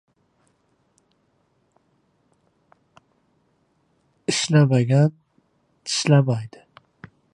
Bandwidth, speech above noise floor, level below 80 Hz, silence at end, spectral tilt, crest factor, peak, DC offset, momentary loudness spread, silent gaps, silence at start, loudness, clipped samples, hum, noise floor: 10.5 kHz; 49 dB; -66 dBFS; 0.85 s; -5.5 dB/octave; 22 dB; -2 dBFS; under 0.1%; 14 LU; none; 4.3 s; -20 LUFS; under 0.1%; none; -67 dBFS